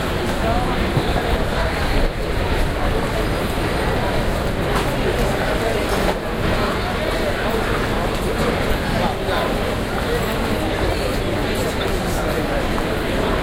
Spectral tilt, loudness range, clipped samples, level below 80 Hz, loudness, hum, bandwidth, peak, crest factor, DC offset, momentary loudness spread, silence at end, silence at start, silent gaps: -5.5 dB/octave; 1 LU; under 0.1%; -26 dBFS; -21 LUFS; none; 16.5 kHz; -4 dBFS; 16 dB; under 0.1%; 2 LU; 0 s; 0 s; none